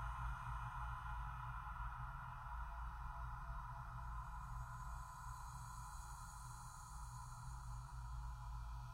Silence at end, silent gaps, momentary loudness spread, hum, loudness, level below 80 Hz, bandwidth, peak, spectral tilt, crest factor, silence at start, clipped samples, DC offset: 0 s; none; 5 LU; none; -51 LUFS; -52 dBFS; 16 kHz; -36 dBFS; -4.5 dB/octave; 14 dB; 0 s; under 0.1%; under 0.1%